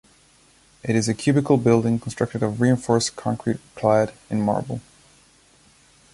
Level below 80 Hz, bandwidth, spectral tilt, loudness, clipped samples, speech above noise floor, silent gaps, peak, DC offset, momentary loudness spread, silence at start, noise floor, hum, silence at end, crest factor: -54 dBFS; 11.5 kHz; -6 dB/octave; -22 LUFS; under 0.1%; 35 dB; none; -4 dBFS; under 0.1%; 8 LU; 0.85 s; -56 dBFS; none; 1.35 s; 18 dB